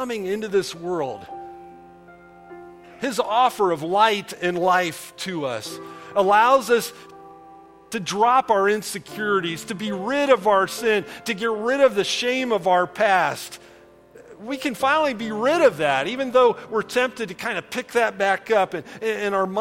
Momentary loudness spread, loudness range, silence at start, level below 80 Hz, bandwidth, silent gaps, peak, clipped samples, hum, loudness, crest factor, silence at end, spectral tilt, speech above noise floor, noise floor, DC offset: 13 LU; 3 LU; 0 s; -64 dBFS; 16.5 kHz; none; -2 dBFS; under 0.1%; none; -21 LUFS; 20 dB; 0 s; -3.5 dB/octave; 27 dB; -48 dBFS; under 0.1%